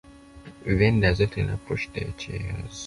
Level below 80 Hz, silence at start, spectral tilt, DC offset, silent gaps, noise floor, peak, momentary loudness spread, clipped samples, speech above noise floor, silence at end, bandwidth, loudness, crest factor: -38 dBFS; 0.05 s; -6.5 dB/octave; under 0.1%; none; -46 dBFS; -6 dBFS; 13 LU; under 0.1%; 21 dB; 0 s; 11.5 kHz; -25 LUFS; 20 dB